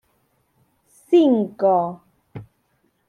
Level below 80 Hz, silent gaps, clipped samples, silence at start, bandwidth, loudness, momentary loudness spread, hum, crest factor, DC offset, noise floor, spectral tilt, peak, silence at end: -68 dBFS; none; under 0.1%; 1.1 s; 10.5 kHz; -19 LUFS; 26 LU; none; 16 dB; under 0.1%; -67 dBFS; -8 dB/octave; -6 dBFS; 0.65 s